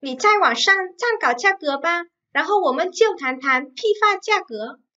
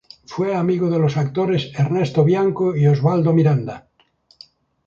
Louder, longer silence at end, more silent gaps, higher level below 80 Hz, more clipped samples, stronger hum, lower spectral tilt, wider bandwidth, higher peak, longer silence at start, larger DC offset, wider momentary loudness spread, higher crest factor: about the same, -19 LUFS vs -18 LUFS; second, 0.25 s vs 1.05 s; neither; second, -78 dBFS vs -56 dBFS; neither; neither; second, -1 dB/octave vs -8.5 dB/octave; first, 8 kHz vs 7.2 kHz; about the same, -4 dBFS vs -4 dBFS; second, 0 s vs 0.3 s; neither; about the same, 8 LU vs 8 LU; about the same, 16 dB vs 16 dB